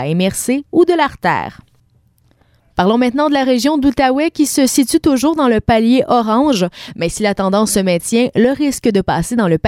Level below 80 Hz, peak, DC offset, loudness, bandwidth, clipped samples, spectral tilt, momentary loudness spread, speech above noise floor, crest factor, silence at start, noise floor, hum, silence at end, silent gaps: -40 dBFS; -2 dBFS; under 0.1%; -14 LUFS; 16.5 kHz; under 0.1%; -5 dB/octave; 5 LU; 41 dB; 12 dB; 0 s; -54 dBFS; none; 0 s; none